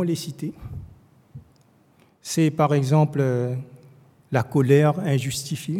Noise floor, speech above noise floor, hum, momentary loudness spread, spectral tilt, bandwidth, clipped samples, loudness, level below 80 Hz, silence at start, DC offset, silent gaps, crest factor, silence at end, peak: -58 dBFS; 37 dB; none; 20 LU; -6.5 dB/octave; 15.5 kHz; under 0.1%; -22 LUFS; -56 dBFS; 0 s; under 0.1%; none; 20 dB; 0 s; -4 dBFS